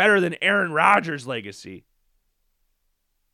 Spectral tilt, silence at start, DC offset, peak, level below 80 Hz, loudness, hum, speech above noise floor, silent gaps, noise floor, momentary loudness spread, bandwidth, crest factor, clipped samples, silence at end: -4.5 dB/octave; 0 s; under 0.1%; -2 dBFS; -70 dBFS; -20 LUFS; none; 51 dB; none; -72 dBFS; 17 LU; 14.5 kHz; 20 dB; under 0.1%; 1.55 s